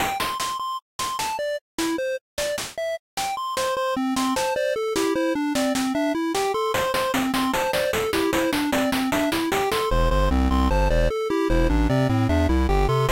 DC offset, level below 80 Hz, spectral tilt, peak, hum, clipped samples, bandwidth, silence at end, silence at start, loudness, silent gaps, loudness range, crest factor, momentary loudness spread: under 0.1%; -30 dBFS; -5 dB/octave; -10 dBFS; none; under 0.1%; 17 kHz; 0 s; 0 s; -23 LUFS; 0.82-0.99 s, 1.61-1.78 s, 2.21-2.37 s, 2.99-3.17 s; 5 LU; 12 dB; 6 LU